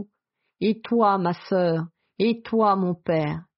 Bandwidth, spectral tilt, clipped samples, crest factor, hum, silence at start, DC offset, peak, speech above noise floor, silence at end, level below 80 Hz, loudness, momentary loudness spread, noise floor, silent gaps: 5.8 kHz; -6 dB/octave; under 0.1%; 16 dB; none; 0 s; under 0.1%; -8 dBFS; 55 dB; 0.15 s; -64 dBFS; -23 LUFS; 7 LU; -78 dBFS; none